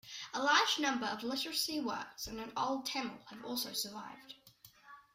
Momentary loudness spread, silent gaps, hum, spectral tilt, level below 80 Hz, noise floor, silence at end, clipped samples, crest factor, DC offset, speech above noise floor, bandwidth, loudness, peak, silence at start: 20 LU; none; none; -1.5 dB/octave; -70 dBFS; -62 dBFS; 0.15 s; under 0.1%; 22 dB; under 0.1%; 25 dB; 16 kHz; -35 LUFS; -16 dBFS; 0.05 s